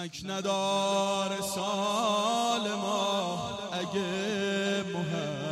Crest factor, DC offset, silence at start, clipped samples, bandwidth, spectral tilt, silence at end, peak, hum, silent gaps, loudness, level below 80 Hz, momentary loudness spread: 14 dB; under 0.1%; 0 s; under 0.1%; 15 kHz; -4 dB/octave; 0 s; -16 dBFS; none; none; -30 LUFS; -68 dBFS; 6 LU